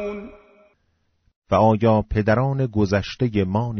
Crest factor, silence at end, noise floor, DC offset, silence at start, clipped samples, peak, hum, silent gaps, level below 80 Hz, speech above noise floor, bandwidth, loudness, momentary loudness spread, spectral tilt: 16 dB; 0 s; -68 dBFS; under 0.1%; 0 s; under 0.1%; -4 dBFS; none; 1.36-1.42 s; -42 dBFS; 48 dB; 6.6 kHz; -20 LUFS; 6 LU; -7 dB/octave